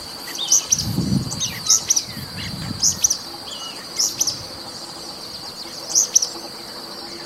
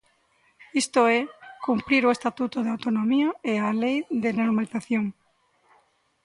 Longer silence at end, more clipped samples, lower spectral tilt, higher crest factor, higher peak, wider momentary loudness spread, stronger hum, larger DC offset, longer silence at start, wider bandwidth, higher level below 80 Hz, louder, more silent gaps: second, 0 s vs 1.15 s; neither; second, -1.5 dB/octave vs -5 dB/octave; first, 22 dB vs 16 dB; first, -2 dBFS vs -10 dBFS; first, 16 LU vs 7 LU; neither; neither; second, 0 s vs 0.75 s; first, 16 kHz vs 11.5 kHz; first, -48 dBFS vs -66 dBFS; first, -19 LUFS vs -25 LUFS; neither